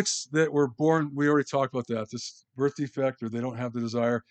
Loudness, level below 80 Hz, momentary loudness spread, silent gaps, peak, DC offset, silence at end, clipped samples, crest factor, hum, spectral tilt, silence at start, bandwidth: -28 LUFS; -78 dBFS; 8 LU; none; -10 dBFS; under 0.1%; 0.1 s; under 0.1%; 18 dB; none; -5 dB/octave; 0 s; 9.2 kHz